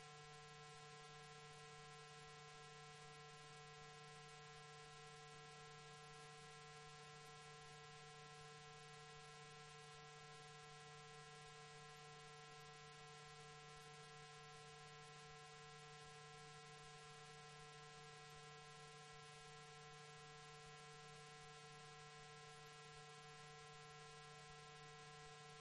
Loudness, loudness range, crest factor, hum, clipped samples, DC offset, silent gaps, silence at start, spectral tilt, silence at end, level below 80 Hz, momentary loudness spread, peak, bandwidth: -60 LUFS; 0 LU; 16 dB; none; under 0.1%; under 0.1%; none; 0 s; -3 dB/octave; 0 s; -80 dBFS; 0 LU; -44 dBFS; 11.5 kHz